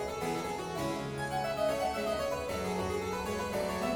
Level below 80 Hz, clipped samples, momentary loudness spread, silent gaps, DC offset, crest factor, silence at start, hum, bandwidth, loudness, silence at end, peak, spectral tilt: -52 dBFS; under 0.1%; 4 LU; none; under 0.1%; 14 dB; 0 s; none; 19 kHz; -34 LUFS; 0 s; -20 dBFS; -4.5 dB/octave